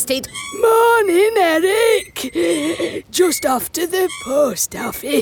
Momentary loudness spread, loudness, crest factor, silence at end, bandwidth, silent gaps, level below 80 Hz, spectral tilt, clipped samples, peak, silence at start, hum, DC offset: 8 LU; -16 LUFS; 14 dB; 0 s; 19 kHz; none; -52 dBFS; -2.5 dB/octave; under 0.1%; -2 dBFS; 0 s; none; under 0.1%